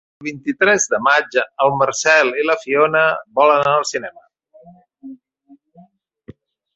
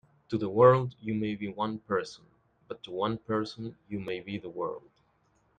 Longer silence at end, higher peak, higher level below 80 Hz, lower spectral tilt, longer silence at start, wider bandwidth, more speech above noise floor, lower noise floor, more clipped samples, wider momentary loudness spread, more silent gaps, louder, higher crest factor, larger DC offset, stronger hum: second, 0.45 s vs 0.8 s; first, -2 dBFS vs -8 dBFS; about the same, -62 dBFS vs -64 dBFS; second, -2.5 dB/octave vs -7.5 dB/octave; about the same, 0.2 s vs 0.3 s; about the same, 8.2 kHz vs 9 kHz; second, 35 dB vs 40 dB; second, -51 dBFS vs -69 dBFS; neither; second, 11 LU vs 19 LU; neither; first, -16 LUFS vs -30 LUFS; second, 16 dB vs 22 dB; neither; neither